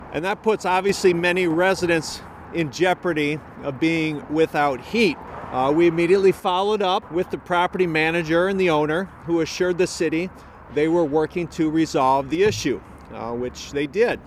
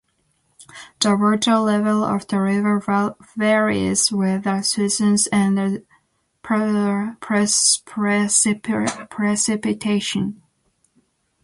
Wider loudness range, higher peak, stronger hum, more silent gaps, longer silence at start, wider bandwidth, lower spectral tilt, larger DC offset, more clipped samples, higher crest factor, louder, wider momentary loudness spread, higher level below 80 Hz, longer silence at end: about the same, 2 LU vs 2 LU; second, -6 dBFS vs -2 dBFS; neither; neither; second, 0 s vs 0.75 s; first, 15 kHz vs 11.5 kHz; first, -5 dB/octave vs -3.5 dB/octave; neither; neither; about the same, 16 dB vs 18 dB; about the same, -21 LUFS vs -19 LUFS; about the same, 10 LU vs 8 LU; first, -50 dBFS vs -58 dBFS; second, 0 s vs 1.1 s